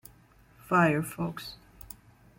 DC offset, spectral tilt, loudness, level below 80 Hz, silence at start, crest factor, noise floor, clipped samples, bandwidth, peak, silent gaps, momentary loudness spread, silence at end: under 0.1%; -6 dB/octave; -28 LUFS; -60 dBFS; 0.7 s; 20 dB; -59 dBFS; under 0.1%; 16.5 kHz; -12 dBFS; none; 23 LU; 0.85 s